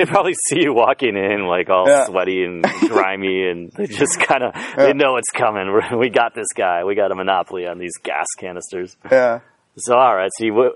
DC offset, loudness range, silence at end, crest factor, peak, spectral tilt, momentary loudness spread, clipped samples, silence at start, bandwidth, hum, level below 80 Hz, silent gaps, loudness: under 0.1%; 4 LU; 0 s; 18 dB; 0 dBFS; -3.5 dB/octave; 12 LU; under 0.1%; 0 s; 11.5 kHz; none; -62 dBFS; none; -17 LUFS